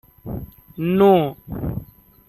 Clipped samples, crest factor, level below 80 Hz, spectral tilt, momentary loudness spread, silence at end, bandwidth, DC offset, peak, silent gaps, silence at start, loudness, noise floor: under 0.1%; 18 dB; -42 dBFS; -9.5 dB/octave; 19 LU; 0.45 s; 13.5 kHz; under 0.1%; -4 dBFS; none; 0.25 s; -19 LUFS; -41 dBFS